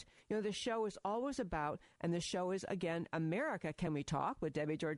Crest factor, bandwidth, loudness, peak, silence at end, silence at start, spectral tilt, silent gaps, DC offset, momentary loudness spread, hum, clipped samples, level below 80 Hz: 14 dB; 11.5 kHz; -40 LUFS; -26 dBFS; 0 s; 0 s; -5.5 dB/octave; none; under 0.1%; 2 LU; none; under 0.1%; -62 dBFS